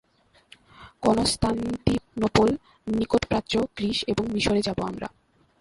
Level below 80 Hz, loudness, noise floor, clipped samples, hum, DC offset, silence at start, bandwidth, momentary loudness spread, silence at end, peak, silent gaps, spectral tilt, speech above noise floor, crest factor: -44 dBFS; -25 LUFS; -56 dBFS; under 0.1%; none; under 0.1%; 0.8 s; 11.5 kHz; 8 LU; 0.5 s; -4 dBFS; none; -5 dB/octave; 32 dB; 22 dB